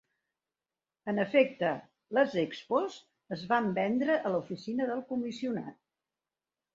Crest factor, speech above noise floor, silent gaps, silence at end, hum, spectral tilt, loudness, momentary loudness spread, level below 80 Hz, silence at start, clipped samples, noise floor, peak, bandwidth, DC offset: 22 dB; over 59 dB; none; 1 s; none; -6.5 dB/octave; -31 LUFS; 13 LU; -76 dBFS; 1.05 s; under 0.1%; under -90 dBFS; -12 dBFS; 7.6 kHz; under 0.1%